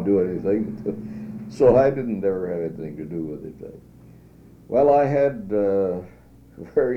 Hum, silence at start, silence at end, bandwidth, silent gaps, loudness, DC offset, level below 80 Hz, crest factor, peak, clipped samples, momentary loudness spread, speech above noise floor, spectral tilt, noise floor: none; 0 s; 0 s; 8.6 kHz; none; -22 LUFS; under 0.1%; -50 dBFS; 18 dB; -4 dBFS; under 0.1%; 18 LU; 27 dB; -9.5 dB/octave; -48 dBFS